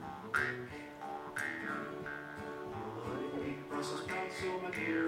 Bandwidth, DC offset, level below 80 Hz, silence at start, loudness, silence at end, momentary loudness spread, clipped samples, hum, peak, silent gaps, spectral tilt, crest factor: 16 kHz; under 0.1%; -66 dBFS; 0 s; -40 LUFS; 0 s; 9 LU; under 0.1%; none; -20 dBFS; none; -5 dB/octave; 20 dB